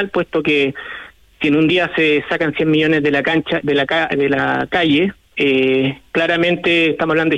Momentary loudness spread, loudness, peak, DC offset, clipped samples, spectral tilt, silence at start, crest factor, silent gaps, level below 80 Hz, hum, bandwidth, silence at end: 5 LU; -16 LUFS; -6 dBFS; under 0.1%; under 0.1%; -6.5 dB/octave; 0 s; 12 dB; none; -50 dBFS; none; 8.8 kHz; 0 s